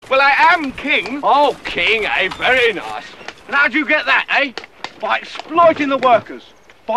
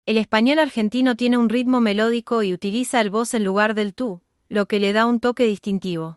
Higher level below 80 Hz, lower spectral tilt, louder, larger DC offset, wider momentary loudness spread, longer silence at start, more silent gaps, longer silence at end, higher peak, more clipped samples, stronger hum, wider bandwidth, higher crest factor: first, -50 dBFS vs -62 dBFS; second, -3.5 dB/octave vs -5 dB/octave; first, -15 LUFS vs -20 LUFS; first, 0.3% vs under 0.1%; first, 16 LU vs 7 LU; about the same, 0.05 s vs 0.05 s; neither; about the same, 0 s vs 0.05 s; first, 0 dBFS vs -4 dBFS; neither; neither; about the same, 13 kHz vs 12 kHz; about the same, 16 dB vs 16 dB